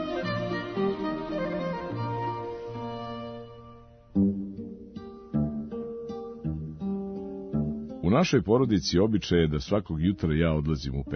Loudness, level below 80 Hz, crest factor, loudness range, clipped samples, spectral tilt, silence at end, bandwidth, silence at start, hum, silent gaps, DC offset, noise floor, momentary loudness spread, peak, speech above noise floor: -29 LUFS; -46 dBFS; 20 dB; 8 LU; under 0.1%; -6.5 dB/octave; 0 s; 6.6 kHz; 0 s; none; none; under 0.1%; -50 dBFS; 14 LU; -10 dBFS; 25 dB